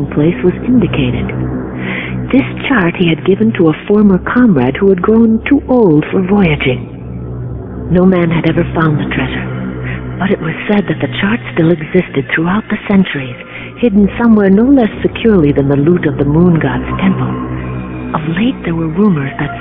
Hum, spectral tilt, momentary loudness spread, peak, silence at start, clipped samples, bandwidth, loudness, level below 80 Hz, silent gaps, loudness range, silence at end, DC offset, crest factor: none; -11 dB/octave; 11 LU; 0 dBFS; 0 s; 0.3%; 3.9 kHz; -12 LUFS; -30 dBFS; none; 4 LU; 0 s; under 0.1%; 12 dB